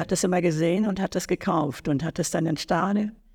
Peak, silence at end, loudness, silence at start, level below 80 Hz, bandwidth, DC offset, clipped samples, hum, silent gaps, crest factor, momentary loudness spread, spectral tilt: -10 dBFS; 0.2 s; -25 LUFS; 0 s; -52 dBFS; 19 kHz; under 0.1%; under 0.1%; none; none; 14 dB; 4 LU; -5.5 dB/octave